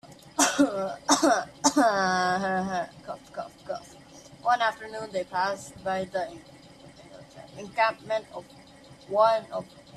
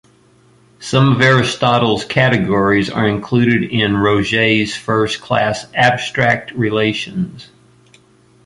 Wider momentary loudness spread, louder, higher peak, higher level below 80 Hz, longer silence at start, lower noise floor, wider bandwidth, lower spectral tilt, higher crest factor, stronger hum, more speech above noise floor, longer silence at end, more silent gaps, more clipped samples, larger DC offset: first, 17 LU vs 6 LU; second, -26 LUFS vs -15 LUFS; second, -6 dBFS vs 0 dBFS; second, -66 dBFS vs -46 dBFS; second, 0.05 s vs 0.8 s; about the same, -51 dBFS vs -50 dBFS; first, 14 kHz vs 11.5 kHz; second, -3 dB/octave vs -5.5 dB/octave; first, 22 dB vs 16 dB; neither; second, 24 dB vs 36 dB; second, 0 s vs 1 s; neither; neither; neither